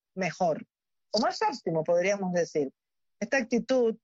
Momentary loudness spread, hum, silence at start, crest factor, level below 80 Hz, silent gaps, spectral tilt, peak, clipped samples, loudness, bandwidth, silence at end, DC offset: 7 LU; none; 0.15 s; 14 dB; -74 dBFS; none; -4 dB/octave; -14 dBFS; under 0.1%; -29 LUFS; 7.8 kHz; 0.1 s; under 0.1%